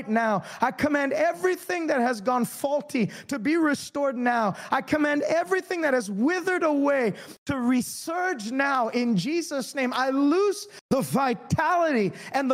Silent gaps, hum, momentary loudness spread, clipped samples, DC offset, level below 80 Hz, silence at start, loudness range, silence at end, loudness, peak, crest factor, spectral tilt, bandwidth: 7.38-7.46 s, 10.81-10.89 s; none; 5 LU; under 0.1%; under 0.1%; -62 dBFS; 0 s; 1 LU; 0 s; -25 LUFS; -8 dBFS; 16 dB; -5 dB/octave; 16 kHz